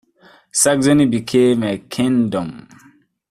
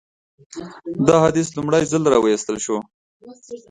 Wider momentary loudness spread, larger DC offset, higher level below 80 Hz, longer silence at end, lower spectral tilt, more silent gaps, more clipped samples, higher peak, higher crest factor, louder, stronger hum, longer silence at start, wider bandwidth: second, 9 LU vs 21 LU; neither; about the same, -54 dBFS vs -54 dBFS; first, 0.7 s vs 0.1 s; about the same, -4.5 dB/octave vs -5.5 dB/octave; second, none vs 2.94-3.20 s; neither; about the same, 0 dBFS vs 0 dBFS; about the same, 16 dB vs 20 dB; about the same, -16 LUFS vs -18 LUFS; neither; about the same, 0.55 s vs 0.55 s; first, 14.5 kHz vs 10.5 kHz